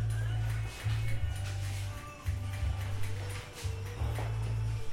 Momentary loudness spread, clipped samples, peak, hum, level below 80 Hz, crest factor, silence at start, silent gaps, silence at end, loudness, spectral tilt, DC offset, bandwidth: 6 LU; under 0.1%; -22 dBFS; none; -42 dBFS; 12 dB; 0 s; none; 0 s; -36 LUFS; -5.5 dB/octave; under 0.1%; 15.5 kHz